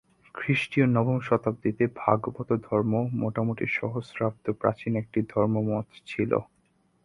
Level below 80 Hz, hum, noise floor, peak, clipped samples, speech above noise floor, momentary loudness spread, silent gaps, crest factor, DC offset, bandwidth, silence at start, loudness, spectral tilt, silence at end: -60 dBFS; none; -67 dBFS; -4 dBFS; under 0.1%; 41 dB; 7 LU; none; 22 dB; under 0.1%; 11 kHz; 0.35 s; -27 LUFS; -8.5 dB/octave; 0.6 s